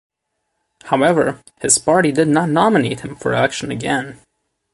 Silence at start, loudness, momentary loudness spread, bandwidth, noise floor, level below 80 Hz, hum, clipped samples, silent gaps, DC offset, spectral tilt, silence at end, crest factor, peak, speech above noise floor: 0.85 s; -16 LUFS; 9 LU; 11.5 kHz; -74 dBFS; -54 dBFS; none; under 0.1%; none; under 0.1%; -4 dB/octave; 0.6 s; 18 dB; 0 dBFS; 57 dB